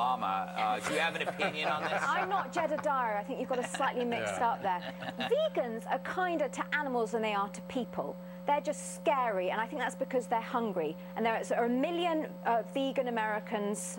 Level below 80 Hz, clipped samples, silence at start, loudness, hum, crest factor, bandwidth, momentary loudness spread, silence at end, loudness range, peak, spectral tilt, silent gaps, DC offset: -68 dBFS; under 0.1%; 0 s; -33 LUFS; none; 16 dB; 16.5 kHz; 5 LU; 0 s; 2 LU; -16 dBFS; -4.5 dB/octave; none; under 0.1%